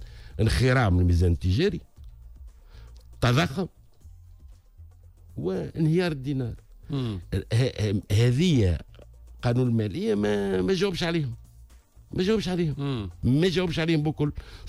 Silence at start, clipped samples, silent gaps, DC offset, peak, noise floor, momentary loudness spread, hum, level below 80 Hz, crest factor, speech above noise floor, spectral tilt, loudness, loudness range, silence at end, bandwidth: 0 s; under 0.1%; none; under 0.1%; -12 dBFS; -51 dBFS; 12 LU; none; -40 dBFS; 14 dB; 27 dB; -7 dB/octave; -26 LUFS; 6 LU; 0 s; 13 kHz